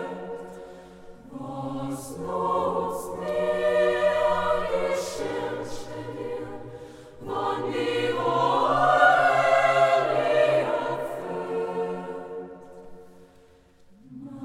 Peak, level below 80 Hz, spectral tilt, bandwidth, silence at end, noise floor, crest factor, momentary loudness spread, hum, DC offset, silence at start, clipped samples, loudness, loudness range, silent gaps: -6 dBFS; -56 dBFS; -5 dB/octave; 16 kHz; 0 s; -55 dBFS; 20 dB; 20 LU; none; under 0.1%; 0 s; under 0.1%; -25 LUFS; 10 LU; none